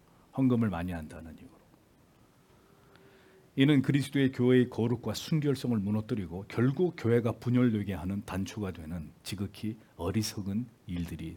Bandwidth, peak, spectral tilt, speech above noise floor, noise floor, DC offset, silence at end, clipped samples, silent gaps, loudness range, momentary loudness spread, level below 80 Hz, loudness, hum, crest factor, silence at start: 18 kHz; -10 dBFS; -7 dB/octave; 32 dB; -62 dBFS; under 0.1%; 0 s; under 0.1%; none; 7 LU; 15 LU; -60 dBFS; -31 LUFS; none; 20 dB; 0.35 s